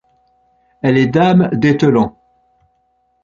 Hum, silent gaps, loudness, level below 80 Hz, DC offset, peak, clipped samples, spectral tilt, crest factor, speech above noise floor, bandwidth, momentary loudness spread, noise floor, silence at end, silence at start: none; none; -13 LUFS; -50 dBFS; under 0.1%; -2 dBFS; under 0.1%; -8 dB/octave; 14 dB; 50 dB; 7.4 kHz; 7 LU; -61 dBFS; 1.15 s; 0.85 s